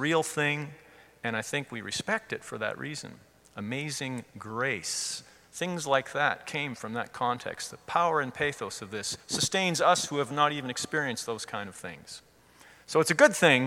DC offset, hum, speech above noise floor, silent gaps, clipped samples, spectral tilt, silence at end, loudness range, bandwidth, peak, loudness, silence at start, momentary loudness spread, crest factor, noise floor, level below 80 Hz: under 0.1%; none; 27 dB; none; under 0.1%; -3 dB/octave; 0 s; 6 LU; 17 kHz; -6 dBFS; -29 LUFS; 0 s; 15 LU; 24 dB; -57 dBFS; -68 dBFS